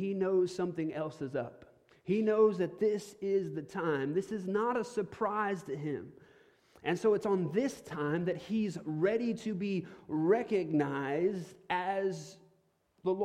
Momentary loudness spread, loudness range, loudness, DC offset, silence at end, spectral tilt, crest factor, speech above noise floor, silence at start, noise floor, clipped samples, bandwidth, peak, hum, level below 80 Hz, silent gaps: 9 LU; 2 LU; -33 LUFS; under 0.1%; 0 s; -7 dB/octave; 18 dB; 40 dB; 0 s; -72 dBFS; under 0.1%; 12.5 kHz; -16 dBFS; none; -72 dBFS; none